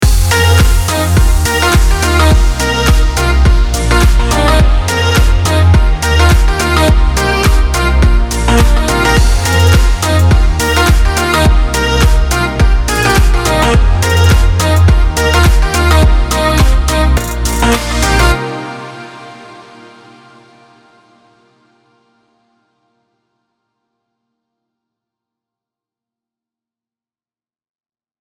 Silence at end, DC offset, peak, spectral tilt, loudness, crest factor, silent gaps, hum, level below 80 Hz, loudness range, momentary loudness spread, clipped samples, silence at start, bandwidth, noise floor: 8.6 s; under 0.1%; 0 dBFS; -4.5 dB/octave; -10 LUFS; 10 dB; none; none; -12 dBFS; 4 LU; 3 LU; under 0.1%; 0 s; 17.5 kHz; under -90 dBFS